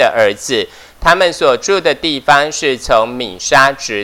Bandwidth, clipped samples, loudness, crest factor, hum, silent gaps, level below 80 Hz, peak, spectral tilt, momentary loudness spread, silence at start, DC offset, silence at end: 18.5 kHz; 0.7%; -12 LUFS; 12 dB; none; none; -38 dBFS; 0 dBFS; -2.5 dB/octave; 7 LU; 0 s; under 0.1%; 0 s